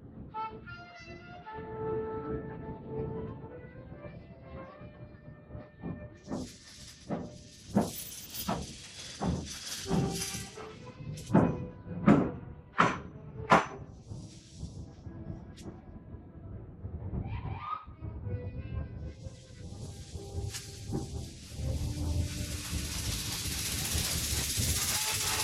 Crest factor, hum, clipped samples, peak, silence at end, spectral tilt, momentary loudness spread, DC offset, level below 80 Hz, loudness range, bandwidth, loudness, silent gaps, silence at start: 28 dB; none; under 0.1%; -8 dBFS; 0 s; -4 dB/octave; 19 LU; under 0.1%; -48 dBFS; 14 LU; 16.5 kHz; -34 LUFS; none; 0 s